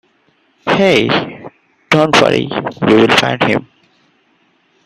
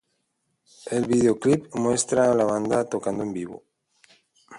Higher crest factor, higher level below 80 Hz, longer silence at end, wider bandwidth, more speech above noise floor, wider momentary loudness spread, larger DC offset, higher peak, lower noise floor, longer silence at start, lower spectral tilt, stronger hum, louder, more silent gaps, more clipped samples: about the same, 14 dB vs 18 dB; first, -50 dBFS vs -60 dBFS; first, 1.25 s vs 0 s; first, 14.5 kHz vs 11.5 kHz; second, 45 dB vs 52 dB; about the same, 11 LU vs 11 LU; neither; first, 0 dBFS vs -6 dBFS; second, -56 dBFS vs -75 dBFS; second, 0.65 s vs 0.85 s; about the same, -5 dB/octave vs -5.5 dB/octave; neither; first, -12 LUFS vs -23 LUFS; neither; neither